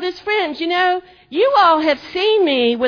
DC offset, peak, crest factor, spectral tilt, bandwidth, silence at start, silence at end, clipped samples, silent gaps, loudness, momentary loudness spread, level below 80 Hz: under 0.1%; -2 dBFS; 14 dB; -4 dB/octave; 5.4 kHz; 0 s; 0 s; under 0.1%; none; -16 LUFS; 7 LU; -58 dBFS